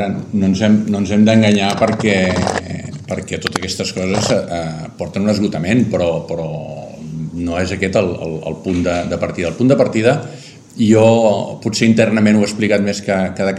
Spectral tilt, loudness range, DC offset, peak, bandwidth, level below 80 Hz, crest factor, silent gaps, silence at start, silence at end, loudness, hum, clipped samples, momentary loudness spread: -6 dB/octave; 5 LU; under 0.1%; 0 dBFS; 11.5 kHz; -46 dBFS; 16 dB; none; 0 s; 0 s; -16 LUFS; none; under 0.1%; 13 LU